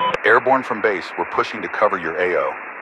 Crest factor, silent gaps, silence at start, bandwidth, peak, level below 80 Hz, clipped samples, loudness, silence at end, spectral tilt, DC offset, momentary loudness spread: 18 dB; none; 0 s; 10.5 kHz; -2 dBFS; -60 dBFS; under 0.1%; -19 LUFS; 0 s; -5 dB/octave; under 0.1%; 8 LU